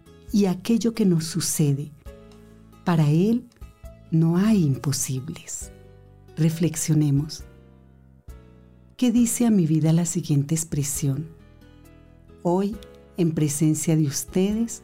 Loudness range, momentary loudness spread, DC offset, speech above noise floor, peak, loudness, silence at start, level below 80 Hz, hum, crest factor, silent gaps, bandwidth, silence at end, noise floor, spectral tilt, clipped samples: 4 LU; 13 LU; under 0.1%; 30 dB; -12 dBFS; -23 LUFS; 0.3 s; -50 dBFS; none; 12 dB; none; 16 kHz; 0.05 s; -52 dBFS; -6 dB/octave; under 0.1%